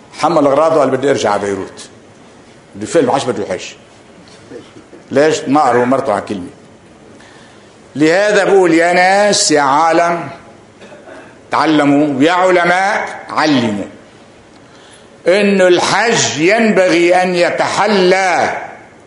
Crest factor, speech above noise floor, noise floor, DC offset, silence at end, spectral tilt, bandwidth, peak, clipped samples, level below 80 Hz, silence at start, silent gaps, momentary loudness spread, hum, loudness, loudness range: 14 dB; 29 dB; -41 dBFS; under 0.1%; 0.25 s; -4 dB/octave; 11 kHz; 0 dBFS; under 0.1%; -54 dBFS; 0.15 s; none; 13 LU; none; -12 LUFS; 6 LU